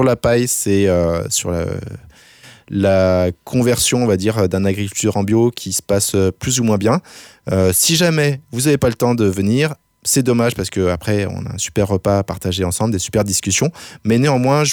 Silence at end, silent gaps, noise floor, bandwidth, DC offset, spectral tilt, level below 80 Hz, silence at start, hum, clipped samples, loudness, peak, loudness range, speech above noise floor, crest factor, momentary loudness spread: 0 s; none; -44 dBFS; over 20 kHz; under 0.1%; -4.5 dB/octave; -42 dBFS; 0 s; none; under 0.1%; -16 LUFS; -4 dBFS; 2 LU; 28 dB; 14 dB; 7 LU